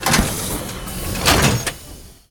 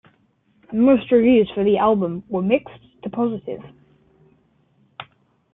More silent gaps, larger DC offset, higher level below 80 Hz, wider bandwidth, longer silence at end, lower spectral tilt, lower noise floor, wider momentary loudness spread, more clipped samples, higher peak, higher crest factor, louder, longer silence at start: neither; neither; first, -30 dBFS vs -56 dBFS; first, 19 kHz vs 3.9 kHz; second, 0.2 s vs 0.5 s; second, -3 dB/octave vs -11 dB/octave; second, -39 dBFS vs -62 dBFS; second, 15 LU vs 20 LU; neither; first, 0 dBFS vs -4 dBFS; about the same, 20 dB vs 16 dB; about the same, -19 LUFS vs -19 LUFS; second, 0 s vs 0.7 s